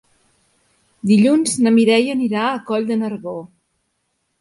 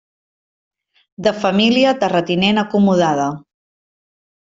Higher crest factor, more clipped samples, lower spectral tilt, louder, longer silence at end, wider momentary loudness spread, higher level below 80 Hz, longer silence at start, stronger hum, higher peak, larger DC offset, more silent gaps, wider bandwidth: about the same, 16 dB vs 16 dB; neither; about the same, -5 dB/octave vs -5.5 dB/octave; about the same, -17 LUFS vs -16 LUFS; about the same, 0.95 s vs 1 s; first, 14 LU vs 7 LU; second, -64 dBFS vs -58 dBFS; second, 1.05 s vs 1.2 s; neither; about the same, -2 dBFS vs -2 dBFS; neither; neither; first, 11.5 kHz vs 7.6 kHz